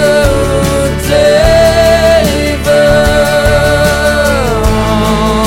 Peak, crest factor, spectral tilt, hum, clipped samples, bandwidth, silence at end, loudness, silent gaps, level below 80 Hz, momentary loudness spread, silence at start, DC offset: 0 dBFS; 8 dB; -5 dB/octave; none; under 0.1%; 17 kHz; 0 s; -9 LUFS; none; -18 dBFS; 4 LU; 0 s; under 0.1%